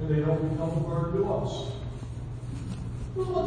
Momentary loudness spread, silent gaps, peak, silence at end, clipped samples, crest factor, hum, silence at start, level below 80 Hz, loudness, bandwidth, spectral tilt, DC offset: 11 LU; none; -14 dBFS; 0 s; under 0.1%; 14 dB; none; 0 s; -42 dBFS; -31 LUFS; 10 kHz; -8 dB/octave; under 0.1%